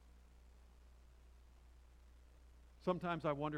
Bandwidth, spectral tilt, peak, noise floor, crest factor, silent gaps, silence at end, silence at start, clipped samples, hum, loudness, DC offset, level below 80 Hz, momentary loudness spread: 13 kHz; -7.5 dB/octave; -24 dBFS; -63 dBFS; 22 dB; none; 0 s; 0.05 s; under 0.1%; none; -41 LUFS; under 0.1%; -64 dBFS; 26 LU